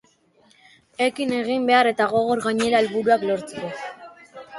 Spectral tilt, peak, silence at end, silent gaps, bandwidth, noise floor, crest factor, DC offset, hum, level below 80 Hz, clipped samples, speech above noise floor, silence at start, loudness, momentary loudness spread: -4.5 dB/octave; -4 dBFS; 0 s; none; 11.5 kHz; -58 dBFS; 18 dB; under 0.1%; none; -64 dBFS; under 0.1%; 38 dB; 1 s; -21 LUFS; 18 LU